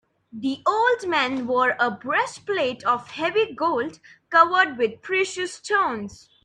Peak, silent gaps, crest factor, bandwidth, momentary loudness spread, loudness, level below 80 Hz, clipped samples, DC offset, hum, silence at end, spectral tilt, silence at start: -2 dBFS; none; 22 dB; 10.5 kHz; 11 LU; -22 LUFS; -66 dBFS; under 0.1%; under 0.1%; none; 0.3 s; -3.5 dB/octave; 0.35 s